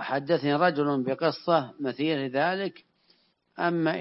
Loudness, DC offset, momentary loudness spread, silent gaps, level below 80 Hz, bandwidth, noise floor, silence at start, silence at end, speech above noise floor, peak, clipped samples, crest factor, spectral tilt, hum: -27 LUFS; under 0.1%; 6 LU; none; -78 dBFS; 5.8 kHz; -66 dBFS; 0 s; 0 s; 40 dB; -8 dBFS; under 0.1%; 18 dB; -9.5 dB/octave; none